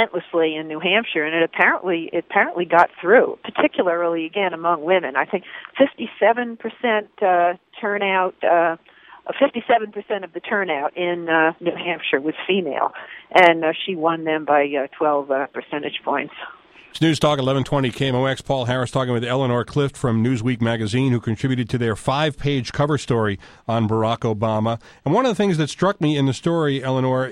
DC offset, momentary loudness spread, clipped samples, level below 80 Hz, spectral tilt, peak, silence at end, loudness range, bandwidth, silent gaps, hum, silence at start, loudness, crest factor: under 0.1%; 8 LU; under 0.1%; -52 dBFS; -6 dB/octave; 0 dBFS; 0 s; 3 LU; 12 kHz; none; none; 0 s; -20 LUFS; 20 dB